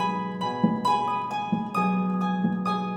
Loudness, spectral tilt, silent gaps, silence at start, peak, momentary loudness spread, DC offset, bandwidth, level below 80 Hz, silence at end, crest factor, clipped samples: -26 LUFS; -7 dB/octave; none; 0 s; -10 dBFS; 4 LU; under 0.1%; 9.2 kHz; -66 dBFS; 0 s; 16 dB; under 0.1%